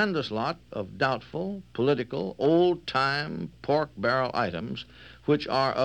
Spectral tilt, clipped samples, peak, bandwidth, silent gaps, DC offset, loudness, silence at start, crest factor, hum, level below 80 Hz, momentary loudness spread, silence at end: -6.5 dB/octave; under 0.1%; -10 dBFS; 9.4 kHz; none; under 0.1%; -28 LUFS; 0 s; 16 dB; none; -58 dBFS; 12 LU; 0 s